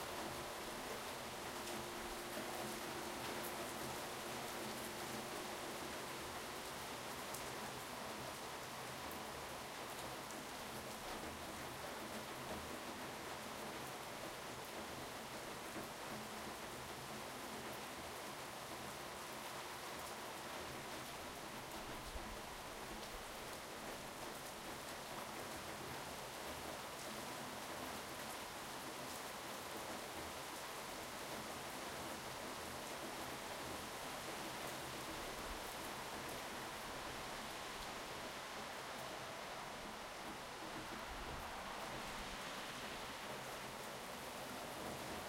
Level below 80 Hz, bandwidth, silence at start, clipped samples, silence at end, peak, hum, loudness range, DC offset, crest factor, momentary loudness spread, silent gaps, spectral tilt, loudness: -66 dBFS; 16 kHz; 0 s; under 0.1%; 0 s; -30 dBFS; none; 3 LU; under 0.1%; 18 dB; 3 LU; none; -2.5 dB/octave; -47 LUFS